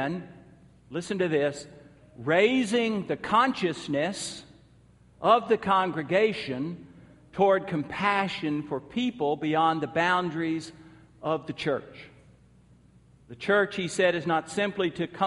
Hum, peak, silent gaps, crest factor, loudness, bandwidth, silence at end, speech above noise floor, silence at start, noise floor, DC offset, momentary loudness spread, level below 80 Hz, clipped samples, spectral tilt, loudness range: none; -8 dBFS; none; 20 dB; -27 LUFS; 11.5 kHz; 0 s; 31 dB; 0 s; -57 dBFS; under 0.1%; 14 LU; -64 dBFS; under 0.1%; -5 dB/octave; 4 LU